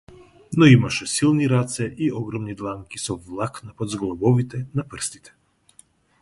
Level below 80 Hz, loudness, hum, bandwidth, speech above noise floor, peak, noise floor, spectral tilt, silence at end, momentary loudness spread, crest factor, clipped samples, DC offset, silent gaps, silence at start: -52 dBFS; -22 LUFS; none; 11.5 kHz; 34 dB; -2 dBFS; -55 dBFS; -5.5 dB/octave; 1.05 s; 15 LU; 22 dB; under 0.1%; under 0.1%; none; 0.5 s